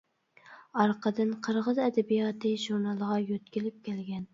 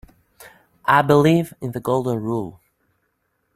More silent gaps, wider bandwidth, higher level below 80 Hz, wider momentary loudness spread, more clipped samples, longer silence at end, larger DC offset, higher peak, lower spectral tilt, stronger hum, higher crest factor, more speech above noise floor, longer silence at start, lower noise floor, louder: neither; second, 7.6 kHz vs 15.5 kHz; second, -76 dBFS vs -56 dBFS; second, 9 LU vs 13 LU; neither; second, 0.1 s vs 1.05 s; neither; second, -10 dBFS vs -2 dBFS; about the same, -6.5 dB/octave vs -7 dB/octave; neither; about the same, 20 dB vs 20 dB; second, 28 dB vs 52 dB; about the same, 0.45 s vs 0.4 s; second, -57 dBFS vs -70 dBFS; second, -30 LUFS vs -19 LUFS